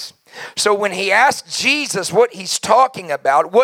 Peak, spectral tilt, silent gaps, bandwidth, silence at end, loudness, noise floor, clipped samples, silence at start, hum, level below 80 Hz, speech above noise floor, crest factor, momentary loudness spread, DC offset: 0 dBFS; -2 dB/octave; none; 16.5 kHz; 0 s; -16 LUFS; -36 dBFS; under 0.1%; 0 s; none; -68 dBFS; 20 dB; 16 dB; 8 LU; under 0.1%